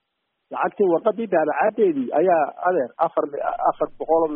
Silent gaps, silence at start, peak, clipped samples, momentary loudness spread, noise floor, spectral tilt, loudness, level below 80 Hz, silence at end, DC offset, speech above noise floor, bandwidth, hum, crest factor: none; 0.5 s; -6 dBFS; under 0.1%; 7 LU; -76 dBFS; -5.5 dB/octave; -21 LUFS; -62 dBFS; 0 s; under 0.1%; 55 dB; 3.7 kHz; none; 16 dB